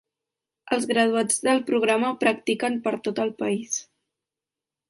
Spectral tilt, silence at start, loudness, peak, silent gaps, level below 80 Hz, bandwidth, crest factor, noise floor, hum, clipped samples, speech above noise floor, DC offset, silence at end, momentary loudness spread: -3 dB/octave; 0.65 s; -24 LUFS; -8 dBFS; none; -72 dBFS; 11.5 kHz; 18 dB; -89 dBFS; none; under 0.1%; 66 dB; under 0.1%; 1.05 s; 7 LU